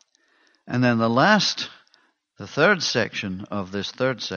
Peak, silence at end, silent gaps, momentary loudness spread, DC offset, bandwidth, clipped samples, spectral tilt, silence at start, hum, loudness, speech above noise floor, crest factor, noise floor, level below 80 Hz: -4 dBFS; 0 s; none; 13 LU; under 0.1%; 7.2 kHz; under 0.1%; -4.5 dB/octave; 0.65 s; none; -22 LUFS; 41 dB; 20 dB; -63 dBFS; -66 dBFS